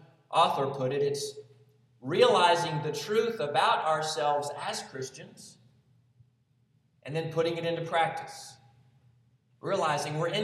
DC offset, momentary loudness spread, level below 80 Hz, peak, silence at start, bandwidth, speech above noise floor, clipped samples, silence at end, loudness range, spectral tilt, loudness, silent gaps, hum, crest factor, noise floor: under 0.1%; 18 LU; -78 dBFS; -8 dBFS; 0.3 s; 14 kHz; 40 dB; under 0.1%; 0 s; 9 LU; -4 dB/octave; -28 LUFS; none; none; 22 dB; -69 dBFS